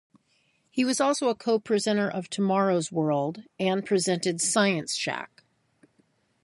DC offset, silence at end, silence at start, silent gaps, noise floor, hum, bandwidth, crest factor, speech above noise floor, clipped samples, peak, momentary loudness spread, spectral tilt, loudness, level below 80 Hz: under 0.1%; 1.2 s; 0.75 s; none; -69 dBFS; none; 11.5 kHz; 20 dB; 43 dB; under 0.1%; -8 dBFS; 7 LU; -4 dB/octave; -26 LUFS; -74 dBFS